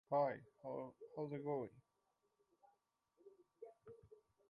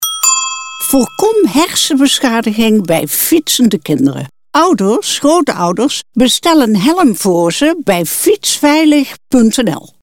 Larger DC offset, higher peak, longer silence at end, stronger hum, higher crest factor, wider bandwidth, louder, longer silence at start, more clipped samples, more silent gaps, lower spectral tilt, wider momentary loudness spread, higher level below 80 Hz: neither; second, -28 dBFS vs 0 dBFS; first, 0.35 s vs 0.15 s; neither; first, 20 dB vs 10 dB; second, 5.2 kHz vs 17 kHz; second, -46 LUFS vs -11 LUFS; about the same, 0.1 s vs 0 s; neither; neither; first, -9.5 dB/octave vs -3.5 dB/octave; first, 22 LU vs 5 LU; second, -86 dBFS vs -46 dBFS